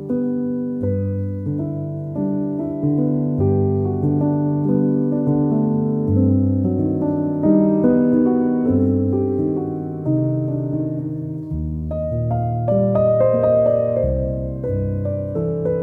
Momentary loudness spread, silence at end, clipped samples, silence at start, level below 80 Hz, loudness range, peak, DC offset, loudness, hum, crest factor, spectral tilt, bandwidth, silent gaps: 9 LU; 0 s; under 0.1%; 0 s; -38 dBFS; 5 LU; -4 dBFS; under 0.1%; -19 LUFS; none; 14 dB; -13.5 dB/octave; 2.7 kHz; none